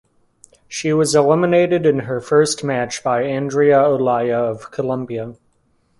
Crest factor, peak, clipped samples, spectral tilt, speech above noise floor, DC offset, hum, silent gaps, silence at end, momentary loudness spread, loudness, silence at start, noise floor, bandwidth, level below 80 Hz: 16 dB; -2 dBFS; under 0.1%; -5 dB/octave; 45 dB; under 0.1%; none; none; 0.65 s; 10 LU; -17 LUFS; 0.7 s; -61 dBFS; 11.5 kHz; -58 dBFS